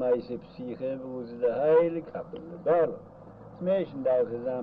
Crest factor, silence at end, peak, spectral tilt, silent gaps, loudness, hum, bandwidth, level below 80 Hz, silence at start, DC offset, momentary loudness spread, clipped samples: 16 dB; 0 s; -12 dBFS; -9.5 dB/octave; none; -28 LUFS; none; 4.9 kHz; -64 dBFS; 0 s; under 0.1%; 17 LU; under 0.1%